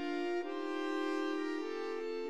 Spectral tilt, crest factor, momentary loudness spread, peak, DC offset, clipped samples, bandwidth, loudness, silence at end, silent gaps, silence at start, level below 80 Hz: -3.5 dB/octave; 12 dB; 3 LU; -26 dBFS; 0.3%; under 0.1%; 11 kHz; -38 LUFS; 0 s; none; 0 s; under -90 dBFS